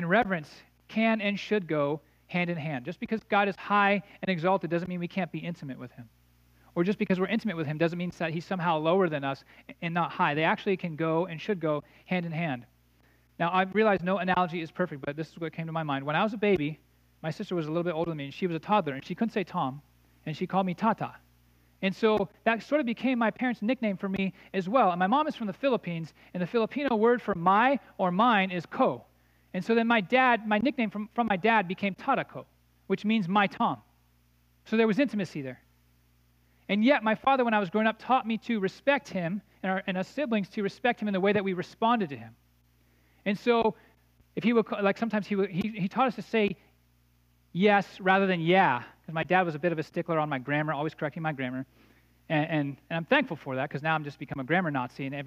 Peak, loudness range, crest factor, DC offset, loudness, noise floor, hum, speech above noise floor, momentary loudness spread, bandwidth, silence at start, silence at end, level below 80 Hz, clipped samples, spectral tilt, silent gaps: -8 dBFS; 5 LU; 20 dB; under 0.1%; -28 LUFS; -65 dBFS; 60 Hz at -60 dBFS; 37 dB; 12 LU; 8 kHz; 0 s; 0 s; -66 dBFS; under 0.1%; -7 dB/octave; none